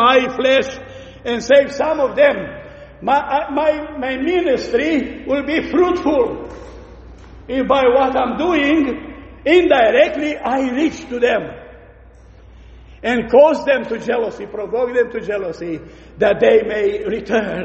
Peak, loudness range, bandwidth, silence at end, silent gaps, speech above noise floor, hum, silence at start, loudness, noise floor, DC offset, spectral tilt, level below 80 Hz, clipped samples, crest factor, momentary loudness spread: 0 dBFS; 4 LU; 8.2 kHz; 0 s; none; 27 dB; none; 0 s; -16 LUFS; -43 dBFS; under 0.1%; -5 dB/octave; -44 dBFS; under 0.1%; 16 dB; 14 LU